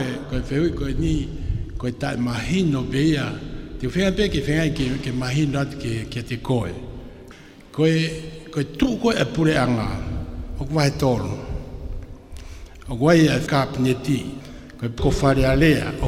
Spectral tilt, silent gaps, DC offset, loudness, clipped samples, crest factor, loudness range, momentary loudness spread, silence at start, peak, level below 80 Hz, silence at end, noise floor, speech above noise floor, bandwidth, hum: -6.5 dB/octave; none; under 0.1%; -22 LUFS; under 0.1%; 18 dB; 4 LU; 17 LU; 0 s; -4 dBFS; -34 dBFS; 0 s; -43 dBFS; 23 dB; 15.5 kHz; none